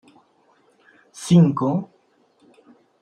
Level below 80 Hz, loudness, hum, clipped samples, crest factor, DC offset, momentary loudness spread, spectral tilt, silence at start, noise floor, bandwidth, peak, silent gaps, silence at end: -62 dBFS; -18 LUFS; none; under 0.1%; 20 dB; under 0.1%; 21 LU; -7.5 dB/octave; 1.15 s; -61 dBFS; 10.5 kHz; -4 dBFS; none; 1.2 s